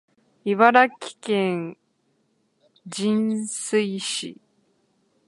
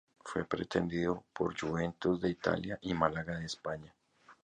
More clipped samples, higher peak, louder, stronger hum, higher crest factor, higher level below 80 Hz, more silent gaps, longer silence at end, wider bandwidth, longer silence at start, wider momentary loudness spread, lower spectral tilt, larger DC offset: neither; first, -2 dBFS vs -12 dBFS; first, -22 LUFS vs -35 LUFS; neither; about the same, 24 dB vs 24 dB; second, -76 dBFS vs -58 dBFS; neither; first, 0.95 s vs 0.15 s; first, 11.5 kHz vs 10 kHz; first, 0.45 s vs 0.25 s; first, 18 LU vs 7 LU; second, -4 dB/octave vs -6 dB/octave; neither